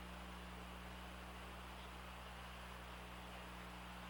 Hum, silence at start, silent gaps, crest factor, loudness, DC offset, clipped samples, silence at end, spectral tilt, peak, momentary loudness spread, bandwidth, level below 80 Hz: 60 Hz at -55 dBFS; 0 s; none; 14 dB; -53 LUFS; under 0.1%; under 0.1%; 0 s; -4.5 dB/octave; -40 dBFS; 0 LU; over 20 kHz; -58 dBFS